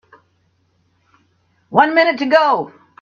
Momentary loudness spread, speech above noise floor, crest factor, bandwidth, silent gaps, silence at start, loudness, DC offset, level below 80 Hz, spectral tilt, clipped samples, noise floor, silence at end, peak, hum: 8 LU; 48 dB; 18 dB; 7 kHz; none; 1.7 s; -14 LUFS; under 0.1%; -66 dBFS; -5.5 dB/octave; under 0.1%; -62 dBFS; 0.35 s; 0 dBFS; none